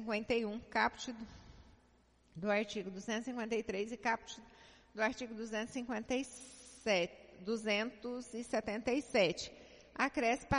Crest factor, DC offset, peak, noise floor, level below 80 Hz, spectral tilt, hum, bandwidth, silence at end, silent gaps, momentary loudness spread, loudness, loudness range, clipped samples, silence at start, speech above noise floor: 20 dB; under 0.1%; -18 dBFS; -69 dBFS; -64 dBFS; -4 dB/octave; none; 10.5 kHz; 0 s; none; 17 LU; -38 LUFS; 3 LU; under 0.1%; 0 s; 32 dB